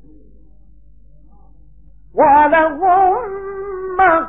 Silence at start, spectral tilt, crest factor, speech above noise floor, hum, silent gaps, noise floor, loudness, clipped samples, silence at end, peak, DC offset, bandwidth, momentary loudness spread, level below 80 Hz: 2.15 s; -10 dB/octave; 14 dB; 35 dB; none; none; -47 dBFS; -14 LUFS; under 0.1%; 0 s; -2 dBFS; 0.8%; 3.8 kHz; 15 LU; -44 dBFS